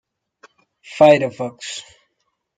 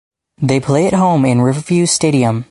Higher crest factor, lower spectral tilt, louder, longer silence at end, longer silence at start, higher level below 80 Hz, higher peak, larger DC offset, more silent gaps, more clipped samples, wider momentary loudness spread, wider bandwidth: first, 18 dB vs 12 dB; about the same, -5 dB/octave vs -5.5 dB/octave; second, -16 LUFS vs -13 LUFS; first, 0.8 s vs 0.05 s; first, 0.9 s vs 0.4 s; second, -62 dBFS vs -48 dBFS; about the same, -2 dBFS vs 0 dBFS; neither; neither; neither; first, 20 LU vs 4 LU; second, 9.2 kHz vs 11.5 kHz